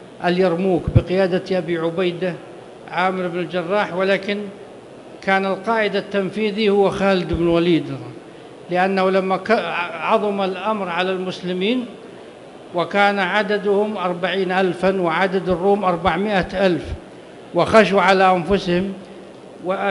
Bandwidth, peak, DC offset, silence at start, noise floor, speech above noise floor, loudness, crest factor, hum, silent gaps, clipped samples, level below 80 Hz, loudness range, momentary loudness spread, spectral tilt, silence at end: 11.5 kHz; 0 dBFS; under 0.1%; 0 s; -39 dBFS; 21 dB; -19 LUFS; 18 dB; none; none; under 0.1%; -42 dBFS; 4 LU; 19 LU; -6.5 dB/octave; 0 s